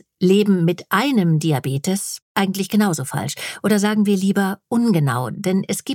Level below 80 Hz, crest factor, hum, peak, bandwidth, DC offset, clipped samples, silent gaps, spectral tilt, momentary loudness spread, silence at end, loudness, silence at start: -66 dBFS; 16 dB; none; -2 dBFS; 17 kHz; under 0.1%; under 0.1%; 2.22-2.35 s; -5.5 dB/octave; 7 LU; 0 s; -19 LUFS; 0.2 s